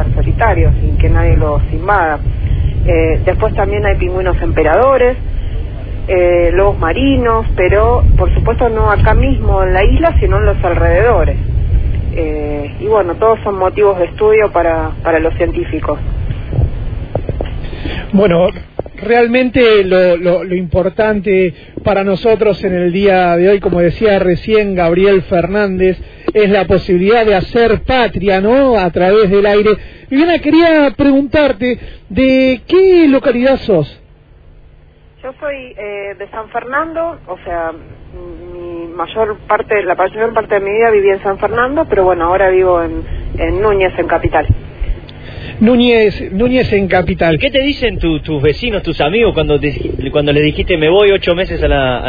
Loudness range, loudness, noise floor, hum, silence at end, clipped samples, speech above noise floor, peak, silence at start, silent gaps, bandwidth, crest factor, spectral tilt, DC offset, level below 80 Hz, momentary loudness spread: 6 LU; -12 LUFS; -41 dBFS; none; 0 s; under 0.1%; 30 dB; 0 dBFS; 0 s; none; 5 kHz; 12 dB; -9.5 dB/octave; under 0.1%; -20 dBFS; 12 LU